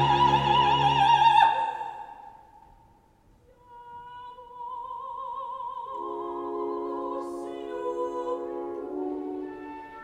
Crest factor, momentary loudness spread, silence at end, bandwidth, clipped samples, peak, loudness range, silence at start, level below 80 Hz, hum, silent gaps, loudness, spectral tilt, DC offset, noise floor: 20 dB; 22 LU; 0 s; 10.5 kHz; under 0.1%; -8 dBFS; 17 LU; 0 s; -54 dBFS; none; none; -26 LUFS; -5.5 dB/octave; under 0.1%; -60 dBFS